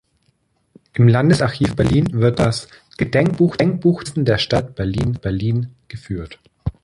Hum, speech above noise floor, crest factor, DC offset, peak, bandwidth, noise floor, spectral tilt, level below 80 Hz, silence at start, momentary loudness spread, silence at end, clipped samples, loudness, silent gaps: none; 47 dB; 16 dB; under 0.1%; -2 dBFS; 11.5 kHz; -64 dBFS; -7 dB/octave; -38 dBFS; 0.95 s; 14 LU; 0.15 s; under 0.1%; -18 LUFS; none